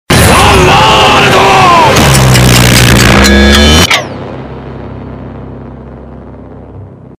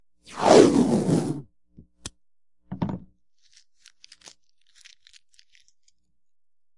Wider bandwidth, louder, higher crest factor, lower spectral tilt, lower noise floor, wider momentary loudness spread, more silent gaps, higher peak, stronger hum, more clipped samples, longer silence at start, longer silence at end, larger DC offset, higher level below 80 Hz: first, over 20 kHz vs 11.5 kHz; first, -3 LUFS vs -20 LUFS; second, 6 dB vs 26 dB; second, -4 dB/octave vs -5.5 dB/octave; second, -28 dBFS vs under -90 dBFS; second, 20 LU vs 27 LU; neither; about the same, 0 dBFS vs 0 dBFS; neither; first, 5% vs under 0.1%; second, 0.1 s vs 0.3 s; second, 0.3 s vs 3.8 s; neither; first, -18 dBFS vs -60 dBFS